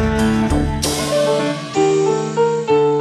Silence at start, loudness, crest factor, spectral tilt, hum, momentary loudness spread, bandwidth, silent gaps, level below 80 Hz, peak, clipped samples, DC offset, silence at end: 0 s; -17 LUFS; 14 dB; -5 dB/octave; none; 3 LU; 13.5 kHz; none; -30 dBFS; -2 dBFS; under 0.1%; under 0.1%; 0 s